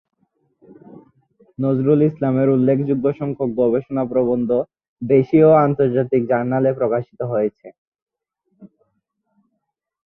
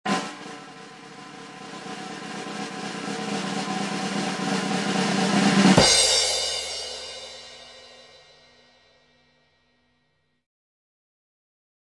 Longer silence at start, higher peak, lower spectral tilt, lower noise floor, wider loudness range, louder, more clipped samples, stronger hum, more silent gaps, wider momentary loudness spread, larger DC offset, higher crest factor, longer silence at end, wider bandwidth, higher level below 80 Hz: first, 0.9 s vs 0.05 s; about the same, -2 dBFS vs -4 dBFS; first, -12 dB/octave vs -3 dB/octave; first, -76 dBFS vs -71 dBFS; second, 6 LU vs 15 LU; first, -18 LUFS vs -22 LUFS; neither; neither; first, 4.88-4.96 s, 7.78-7.92 s, 8.02-8.06 s vs none; second, 10 LU vs 25 LU; neither; second, 18 dB vs 24 dB; second, 1.4 s vs 4 s; second, 4 kHz vs 11.5 kHz; about the same, -58 dBFS vs -54 dBFS